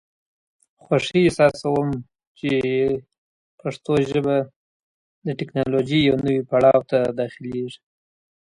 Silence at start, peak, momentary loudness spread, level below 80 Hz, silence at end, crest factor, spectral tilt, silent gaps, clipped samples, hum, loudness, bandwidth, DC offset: 0.9 s; -4 dBFS; 14 LU; -54 dBFS; 0.8 s; 18 dB; -6.5 dB/octave; 2.27-2.35 s, 3.18-3.58 s, 4.56-5.22 s; under 0.1%; none; -21 LUFS; 11.5 kHz; under 0.1%